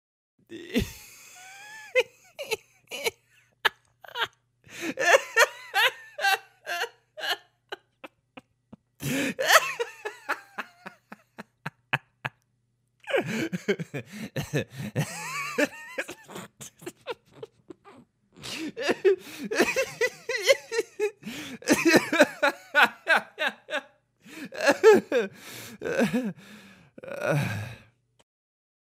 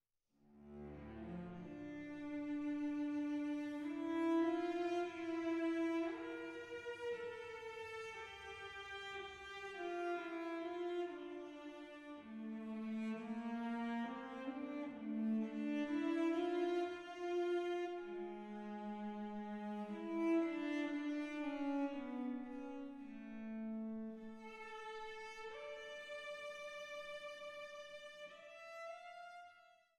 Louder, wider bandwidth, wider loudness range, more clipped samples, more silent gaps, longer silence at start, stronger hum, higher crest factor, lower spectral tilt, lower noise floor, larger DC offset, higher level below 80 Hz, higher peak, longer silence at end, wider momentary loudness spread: first, -26 LUFS vs -44 LUFS; first, 16 kHz vs 10.5 kHz; about the same, 10 LU vs 9 LU; neither; neither; about the same, 0.5 s vs 0.5 s; neither; first, 26 dB vs 16 dB; second, -3.5 dB/octave vs -6 dB/octave; second, -72 dBFS vs -76 dBFS; neither; first, -60 dBFS vs -76 dBFS; first, -2 dBFS vs -28 dBFS; first, 1.2 s vs 0.25 s; first, 23 LU vs 13 LU